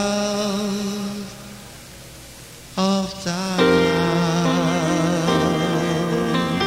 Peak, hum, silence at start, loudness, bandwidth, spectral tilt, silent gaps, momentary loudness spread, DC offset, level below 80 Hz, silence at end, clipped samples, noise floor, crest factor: -4 dBFS; none; 0 s; -20 LUFS; 16 kHz; -5 dB/octave; none; 21 LU; under 0.1%; -48 dBFS; 0 s; under 0.1%; -40 dBFS; 18 dB